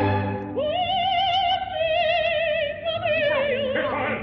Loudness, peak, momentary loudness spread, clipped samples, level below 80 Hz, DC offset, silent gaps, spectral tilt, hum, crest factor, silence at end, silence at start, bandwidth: -23 LUFS; -10 dBFS; 5 LU; under 0.1%; -48 dBFS; under 0.1%; none; -6.5 dB/octave; none; 12 dB; 0 s; 0 s; 6.2 kHz